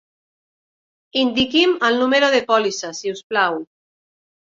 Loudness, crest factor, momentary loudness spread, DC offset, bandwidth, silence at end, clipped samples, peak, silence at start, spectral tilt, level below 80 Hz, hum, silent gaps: -18 LUFS; 18 dB; 10 LU; under 0.1%; 7.6 kHz; 0.85 s; under 0.1%; -2 dBFS; 1.15 s; -3 dB/octave; -56 dBFS; none; 3.24-3.30 s